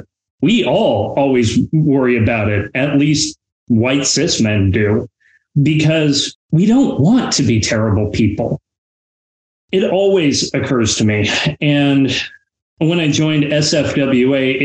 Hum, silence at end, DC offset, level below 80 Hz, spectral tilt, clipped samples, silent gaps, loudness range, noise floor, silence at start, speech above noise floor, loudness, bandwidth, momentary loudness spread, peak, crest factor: none; 0 s; under 0.1%; -42 dBFS; -5 dB/octave; under 0.1%; 3.52-3.67 s, 6.35-6.49 s, 8.78-9.68 s, 12.62-12.77 s; 2 LU; under -90 dBFS; 0.4 s; over 76 dB; -14 LUFS; 9.4 kHz; 5 LU; -4 dBFS; 10 dB